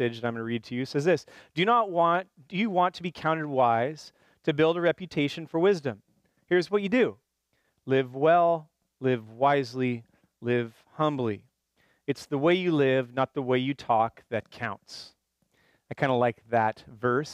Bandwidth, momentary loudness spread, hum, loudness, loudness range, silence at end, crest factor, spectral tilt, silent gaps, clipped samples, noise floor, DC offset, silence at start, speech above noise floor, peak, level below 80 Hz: 12.5 kHz; 12 LU; none; -27 LUFS; 3 LU; 0 s; 18 dB; -6.5 dB/octave; none; under 0.1%; -74 dBFS; under 0.1%; 0 s; 48 dB; -10 dBFS; -70 dBFS